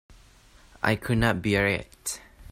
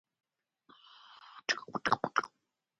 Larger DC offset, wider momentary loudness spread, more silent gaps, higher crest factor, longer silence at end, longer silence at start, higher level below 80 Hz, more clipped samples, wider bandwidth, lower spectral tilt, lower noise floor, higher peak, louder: neither; second, 11 LU vs 22 LU; neither; second, 20 dB vs 28 dB; second, 0 s vs 0.55 s; second, 0.85 s vs 1.2 s; first, -46 dBFS vs -76 dBFS; neither; first, 16 kHz vs 11 kHz; first, -5 dB/octave vs -2.5 dB/octave; second, -55 dBFS vs -83 dBFS; first, -8 dBFS vs -12 dBFS; first, -26 LUFS vs -34 LUFS